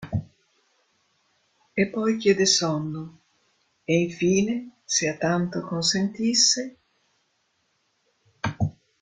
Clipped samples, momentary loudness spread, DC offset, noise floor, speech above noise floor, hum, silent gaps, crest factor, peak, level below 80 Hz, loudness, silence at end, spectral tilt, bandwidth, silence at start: under 0.1%; 14 LU; under 0.1%; -71 dBFS; 48 dB; none; none; 20 dB; -6 dBFS; -58 dBFS; -23 LUFS; 0.3 s; -3.5 dB/octave; 11 kHz; 0 s